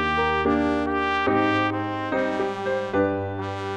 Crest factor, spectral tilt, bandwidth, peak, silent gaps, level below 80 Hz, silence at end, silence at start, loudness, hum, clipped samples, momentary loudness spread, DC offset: 14 dB; -6.5 dB/octave; 9 kHz; -8 dBFS; none; -46 dBFS; 0 s; 0 s; -24 LUFS; none; under 0.1%; 6 LU; under 0.1%